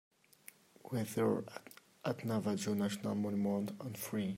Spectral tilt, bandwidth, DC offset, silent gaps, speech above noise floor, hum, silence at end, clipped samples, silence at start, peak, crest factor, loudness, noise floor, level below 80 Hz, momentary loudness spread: -6 dB/octave; 16 kHz; under 0.1%; none; 24 dB; none; 0 s; under 0.1%; 0.85 s; -22 dBFS; 16 dB; -38 LUFS; -61 dBFS; -78 dBFS; 22 LU